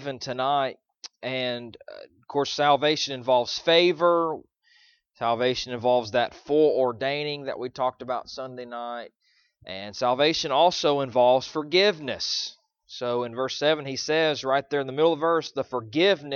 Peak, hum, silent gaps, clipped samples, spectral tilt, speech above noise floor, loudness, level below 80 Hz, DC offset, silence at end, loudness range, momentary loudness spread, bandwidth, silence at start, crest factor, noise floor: -6 dBFS; none; none; under 0.1%; -4 dB/octave; 36 dB; -24 LUFS; -66 dBFS; under 0.1%; 0 s; 4 LU; 15 LU; 7.2 kHz; 0 s; 18 dB; -61 dBFS